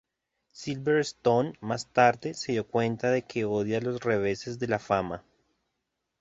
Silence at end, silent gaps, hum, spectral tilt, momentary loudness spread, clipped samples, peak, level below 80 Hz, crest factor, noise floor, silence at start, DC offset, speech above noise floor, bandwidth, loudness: 1 s; none; none; -5.5 dB/octave; 10 LU; under 0.1%; -6 dBFS; -62 dBFS; 22 dB; -82 dBFS; 0.55 s; under 0.1%; 55 dB; 8 kHz; -28 LUFS